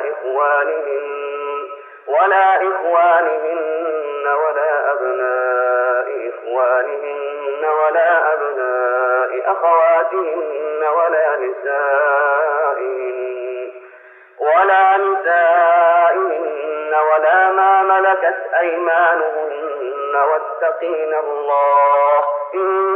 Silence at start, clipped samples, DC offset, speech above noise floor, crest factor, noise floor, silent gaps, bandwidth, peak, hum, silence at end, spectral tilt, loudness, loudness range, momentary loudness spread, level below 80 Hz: 0 s; under 0.1%; under 0.1%; 27 dB; 14 dB; -43 dBFS; none; 3.8 kHz; -2 dBFS; none; 0 s; -5.5 dB/octave; -16 LUFS; 4 LU; 11 LU; under -90 dBFS